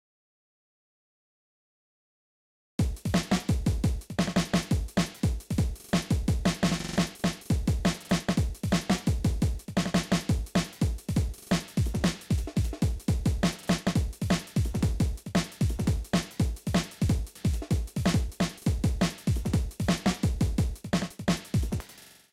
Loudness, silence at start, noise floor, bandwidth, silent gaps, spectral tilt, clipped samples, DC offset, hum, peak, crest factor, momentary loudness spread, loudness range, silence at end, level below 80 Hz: -29 LUFS; 2.8 s; -52 dBFS; 16 kHz; none; -5.5 dB/octave; under 0.1%; under 0.1%; none; -14 dBFS; 14 dB; 4 LU; 2 LU; 0.3 s; -36 dBFS